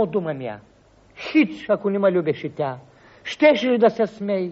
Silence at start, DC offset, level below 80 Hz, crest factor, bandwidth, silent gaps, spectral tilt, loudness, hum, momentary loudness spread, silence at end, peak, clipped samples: 0 s; under 0.1%; -62 dBFS; 16 dB; 7.6 kHz; none; -4.5 dB/octave; -21 LUFS; none; 17 LU; 0 s; -4 dBFS; under 0.1%